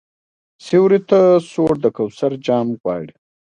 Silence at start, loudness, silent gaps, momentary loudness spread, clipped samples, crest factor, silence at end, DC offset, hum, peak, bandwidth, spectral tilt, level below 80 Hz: 0.65 s; -16 LUFS; 2.80-2.84 s; 11 LU; under 0.1%; 16 dB; 0.4 s; under 0.1%; none; -2 dBFS; 9.8 kHz; -7.5 dB/octave; -56 dBFS